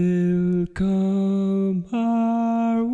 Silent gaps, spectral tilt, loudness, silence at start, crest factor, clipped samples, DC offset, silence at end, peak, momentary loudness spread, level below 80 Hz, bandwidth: none; -9.5 dB/octave; -22 LUFS; 0 s; 8 dB; under 0.1%; under 0.1%; 0 s; -12 dBFS; 3 LU; -48 dBFS; 7.6 kHz